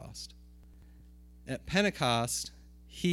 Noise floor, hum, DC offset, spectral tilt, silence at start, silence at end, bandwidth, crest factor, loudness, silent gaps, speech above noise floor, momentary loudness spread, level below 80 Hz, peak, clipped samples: -54 dBFS; 60 Hz at -55 dBFS; under 0.1%; -4 dB/octave; 0 s; 0 s; 17 kHz; 22 dB; -31 LUFS; none; 23 dB; 20 LU; -54 dBFS; -12 dBFS; under 0.1%